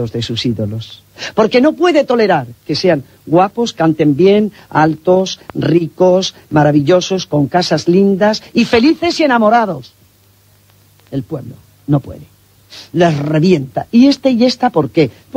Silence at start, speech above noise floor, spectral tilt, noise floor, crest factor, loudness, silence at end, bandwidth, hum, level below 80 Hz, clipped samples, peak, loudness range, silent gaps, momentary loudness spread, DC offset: 0 s; 37 dB; -6 dB/octave; -49 dBFS; 14 dB; -13 LUFS; 0 s; 16 kHz; none; -48 dBFS; under 0.1%; 0 dBFS; 6 LU; none; 11 LU; under 0.1%